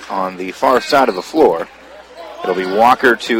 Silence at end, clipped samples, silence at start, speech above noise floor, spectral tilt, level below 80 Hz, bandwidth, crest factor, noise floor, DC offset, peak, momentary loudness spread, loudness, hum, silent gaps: 0 s; under 0.1%; 0 s; 22 dB; -4 dB/octave; -52 dBFS; 17 kHz; 16 dB; -36 dBFS; under 0.1%; 0 dBFS; 15 LU; -14 LUFS; none; none